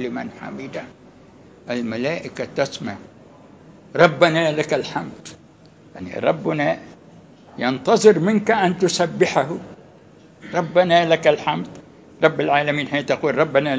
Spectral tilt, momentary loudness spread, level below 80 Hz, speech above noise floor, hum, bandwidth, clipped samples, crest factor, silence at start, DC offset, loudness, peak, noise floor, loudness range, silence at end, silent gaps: -5 dB/octave; 18 LU; -60 dBFS; 29 dB; none; 8 kHz; under 0.1%; 20 dB; 0 s; under 0.1%; -19 LUFS; 0 dBFS; -48 dBFS; 7 LU; 0 s; none